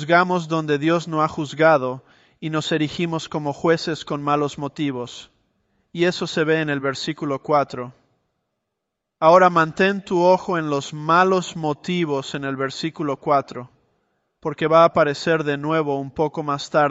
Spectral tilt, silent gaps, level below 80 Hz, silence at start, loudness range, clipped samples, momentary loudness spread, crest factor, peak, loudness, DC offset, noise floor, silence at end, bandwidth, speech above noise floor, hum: -5.5 dB/octave; none; -60 dBFS; 0 s; 6 LU; under 0.1%; 11 LU; 18 dB; -2 dBFS; -20 LUFS; under 0.1%; -80 dBFS; 0 s; 8.2 kHz; 60 dB; none